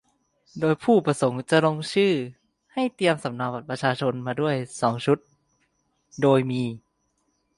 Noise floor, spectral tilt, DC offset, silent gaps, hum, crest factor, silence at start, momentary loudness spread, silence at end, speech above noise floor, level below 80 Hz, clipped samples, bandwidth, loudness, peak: -72 dBFS; -6 dB/octave; under 0.1%; none; none; 18 dB; 0.55 s; 10 LU; 0.8 s; 49 dB; -66 dBFS; under 0.1%; 11.5 kHz; -24 LUFS; -6 dBFS